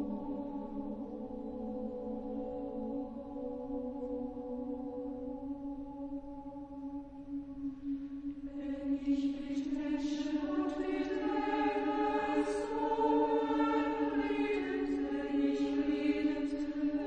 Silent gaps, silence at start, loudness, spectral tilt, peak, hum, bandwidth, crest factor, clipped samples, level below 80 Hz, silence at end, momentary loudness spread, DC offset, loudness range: none; 0 s; -36 LUFS; -6 dB/octave; -20 dBFS; none; 9 kHz; 16 dB; under 0.1%; -58 dBFS; 0 s; 11 LU; under 0.1%; 10 LU